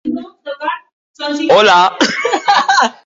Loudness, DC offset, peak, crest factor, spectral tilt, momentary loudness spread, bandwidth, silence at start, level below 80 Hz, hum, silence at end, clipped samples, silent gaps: -12 LUFS; under 0.1%; 0 dBFS; 14 dB; -2.5 dB/octave; 16 LU; 7.8 kHz; 0.05 s; -62 dBFS; none; 0.15 s; under 0.1%; 0.92-1.14 s